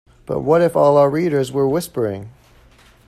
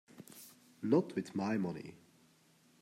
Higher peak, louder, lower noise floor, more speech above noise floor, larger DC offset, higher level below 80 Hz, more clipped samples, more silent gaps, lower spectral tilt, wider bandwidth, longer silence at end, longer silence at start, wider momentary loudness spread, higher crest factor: first, -4 dBFS vs -16 dBFS; first, -17 LUFS vs -36 LUFS; second, -49 dBFS vs -68 dBFS; about the same, 33 dB vs 33 dB; neither; first, -50 dBFS vs -82 dBFS; neither; neither; about the same, -7 dB/octave vs -7 dB/octave; second, 14 kHz vs 16 kHz; second, 0.75 s vs 0.9 s; about the same, 0.3 s vs 0.2 s; second, 11 LU vs 22 LU; second, 14 dB vs 22 dB